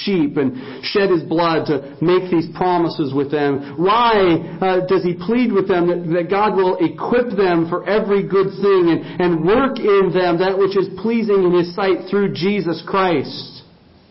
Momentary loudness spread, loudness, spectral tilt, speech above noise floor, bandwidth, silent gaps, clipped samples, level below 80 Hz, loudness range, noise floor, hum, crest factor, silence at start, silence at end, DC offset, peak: 5 LU; -17 LUFS; -11 dB/octave; 31 dB; 5.8 kHz; none; under 0.1%; -50 dBFS; 2 LU; -47 dBFS; none; 12 dB; 0 s; 0.5 s; under 0.1%; -4 dBFS